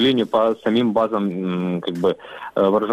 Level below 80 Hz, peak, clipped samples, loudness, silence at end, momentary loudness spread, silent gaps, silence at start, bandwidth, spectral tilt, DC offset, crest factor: -60 dBFS; -4 dBFS; under 0.1%; -20 LUFS; 0 s; 6 LU; none; 0 s; 13.5 kHz; -7.5 dB/octave; under 0.1%; 14 dB